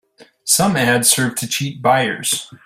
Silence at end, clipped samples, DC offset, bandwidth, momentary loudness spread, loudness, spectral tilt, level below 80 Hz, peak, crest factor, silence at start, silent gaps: 0.1 s; under 0.1%; under 0.1%; 16 kHz; 8 LU; -16 LUFS; -2.5 dB/octave; -56 dBFS; 0 dBFS; 18 dB; 0.2 s; none